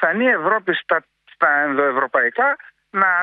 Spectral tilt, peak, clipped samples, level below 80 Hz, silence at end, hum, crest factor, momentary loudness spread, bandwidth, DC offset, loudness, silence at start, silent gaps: -8 dB/octave; -2 dBFS; under 0.1%; -74 dBFS; 0 s; none; 18 dB; 6 LU; 4.6 kHz; under 0.1%; -18 LUFS; 0 s; none